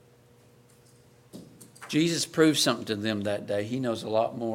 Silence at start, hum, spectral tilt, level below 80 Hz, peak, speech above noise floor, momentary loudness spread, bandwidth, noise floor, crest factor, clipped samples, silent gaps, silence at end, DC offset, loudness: 1.35 s; none; -4 dB/octave; -70 dBFS; -8 dBFS; 31 dB; 12 LU; 16.5 kHz; -58 dBFS; 20 dB; under 0.1%; none; 0 s; under 0.1%; -27 LUFS